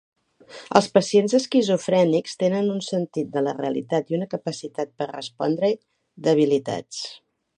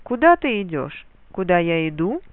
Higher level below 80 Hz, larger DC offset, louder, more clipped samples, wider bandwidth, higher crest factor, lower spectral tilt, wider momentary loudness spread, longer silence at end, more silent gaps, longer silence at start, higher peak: second, -68 dBFS vs -48 dBFS; second, under 0.1% vs 0.2%; second, -23 LUFS vs -20 LUFS; neither; first, 10.5 kHz vs 4.1 kHz; about the same, 22 dB vs 18 dB; second, -5.5 dB/octave vs -10.5 dB/octave; second, 12 LU vs 17 LU; first, 0.4 s vs 0.15 s; neither; first, 0.5 s vs 0.05 s; about the same, 0 dBFS vs -2 dBFS